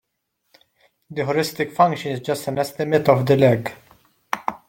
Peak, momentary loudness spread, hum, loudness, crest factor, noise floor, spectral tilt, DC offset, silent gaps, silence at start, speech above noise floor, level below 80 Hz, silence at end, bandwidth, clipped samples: -2 dBFS; 11 LU; none; -20 LUFS; 20 dB; -74 dBFS; -6 dB/octave; under 0.1%; none; 1.1 s; 55 dB; -60 dBFS; 0.15 s; 17 kHz; under 0.1%